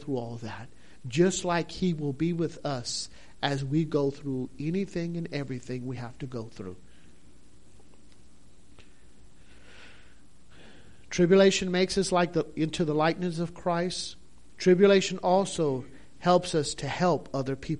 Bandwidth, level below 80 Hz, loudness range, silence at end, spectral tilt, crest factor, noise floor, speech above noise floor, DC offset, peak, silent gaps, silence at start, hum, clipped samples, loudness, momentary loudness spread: 11 kHz; -56 dBFS; 13 LU; 0 s; -5.5 dB/octave; 20 dB; -58 dBFS; 31 dB; 0.5%; -8 dBFS; none; 0 s; none; under 0.1%; -28 LUFS; 16 LU